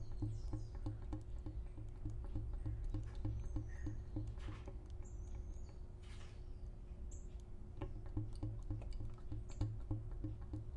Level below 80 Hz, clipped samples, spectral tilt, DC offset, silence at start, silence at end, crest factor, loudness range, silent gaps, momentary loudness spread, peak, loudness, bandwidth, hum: -48 dBFS; under 0.1%; -8 dB/octave; under 0.1%; 0 s; 0 s; 18 dB; 5 LU; none; 9 LU; -26 dBFS; -49 LUFS; 9.8 kHz; none